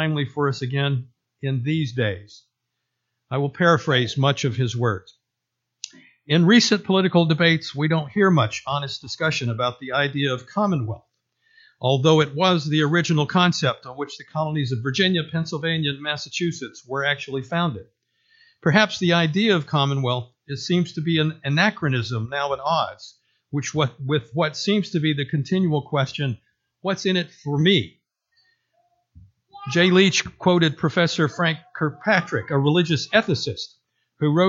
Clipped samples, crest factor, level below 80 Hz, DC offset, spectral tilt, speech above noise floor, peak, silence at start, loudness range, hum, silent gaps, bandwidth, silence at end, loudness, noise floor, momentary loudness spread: under 0.1%; 20 dB; -62 dBFS; under 0.1%; -5.5 dB/octave; 60 dB; -2 dBFS; 0 s; 5 LU; none; none; 7.8 kHz; 0 s; -21 LUFS; -81 dBFS; 11 LU